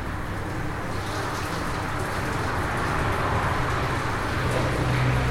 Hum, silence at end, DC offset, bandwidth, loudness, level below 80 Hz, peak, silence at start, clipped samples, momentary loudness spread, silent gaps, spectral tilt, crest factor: none; 0 s; under 0.1%; 16 kHz; -26 LUFS; -36 dBFS; -12 dBFS; 0 s; under 0.1%; 6 LU; none; -5.5 dB/octave; 14 dB